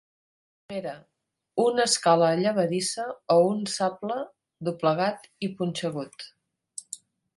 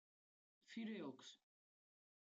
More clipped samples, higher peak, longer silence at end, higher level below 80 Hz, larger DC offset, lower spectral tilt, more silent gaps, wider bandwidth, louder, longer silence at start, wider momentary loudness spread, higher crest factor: neither; first, -8 dBFS vs -42 dBFS; second, 0.4 s vs 0.9 s; first, -72 dBFS vs under -90 dBFS; neither; about the same, -4 dB/octave vs -5 dB/octave; neither; first, 11.5 kHz vs 8 kHz; first, -26 LUFS vs -53 LUFS; about the same, 0.7 s vs 0.65 s; first, 20 LU vs 13 LU; about the same, 20 dB vs 16 dB